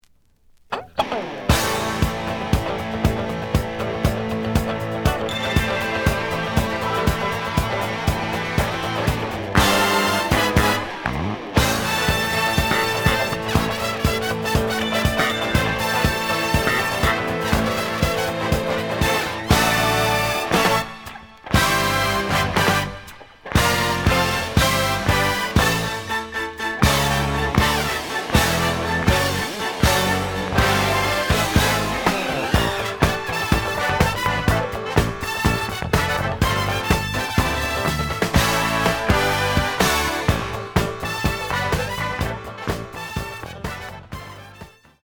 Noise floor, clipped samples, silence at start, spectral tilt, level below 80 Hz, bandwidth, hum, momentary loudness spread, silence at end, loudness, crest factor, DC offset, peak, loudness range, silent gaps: -55 dBFS; under 0.1%; 0.7 s; -4.5 dB/octave; -32 dBFS; over 20 kHz; none; 7 LU; 0.35 s; -20 LUFS; 18 dB; under 0.1%; -2 dBFS; 3 LU; none